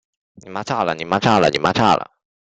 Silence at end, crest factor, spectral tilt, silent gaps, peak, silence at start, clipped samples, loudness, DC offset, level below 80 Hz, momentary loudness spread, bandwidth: 0.35 s; 18 dB; -5 dB/octave; none; 0 dBFS; 0.45 s; under 0.1%; -17 LUFS; under 0.1%; -52 dBFS; 15 LU; 9.2 kHz